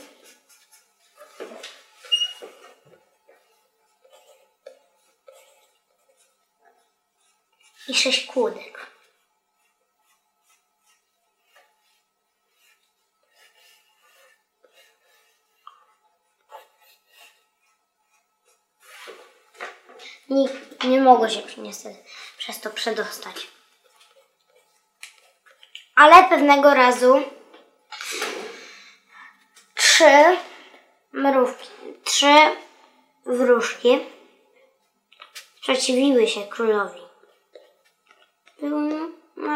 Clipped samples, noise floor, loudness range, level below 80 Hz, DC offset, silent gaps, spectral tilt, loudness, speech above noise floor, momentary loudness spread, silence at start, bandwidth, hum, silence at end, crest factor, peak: under 0.1%; -73 dBFS; 15 LU; -70 dBFS; under 0.1%; none; -1 dB/octave; -18 LUFS; 55 dB; 28 LU; 1.4 s; 16 kHz; none; 0 s; 24 dB; 0 dBFS